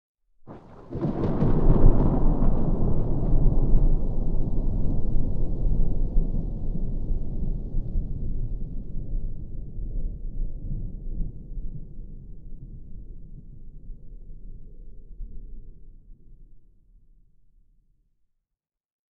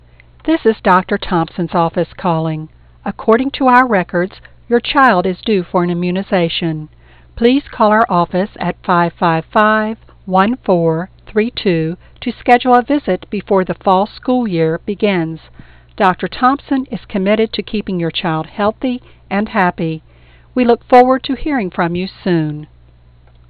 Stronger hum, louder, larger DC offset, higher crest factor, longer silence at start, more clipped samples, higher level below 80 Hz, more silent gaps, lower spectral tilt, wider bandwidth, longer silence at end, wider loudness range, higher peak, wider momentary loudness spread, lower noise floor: neither; second, -29 LUFS vs -15 LUFS; second, under 0.1% vs 0.1%; first, 20 dB vs 14 dB; about the same, 0.45 s vs 0.45 s; neither; first, -26 dBFS vs -42 dBFS; neither; first, -12 dB/octave vs -8.5 dB/octave; second, 1.7 kHz vs 5.6 kHz; first, 2.55 s vs 0.85 s; first, 23 LU vs 3 LU; second, -4 dBFS vs 0 dBFS; first, 23 LU vs 11 LU; first, -86 dBFS vs -45 dBFS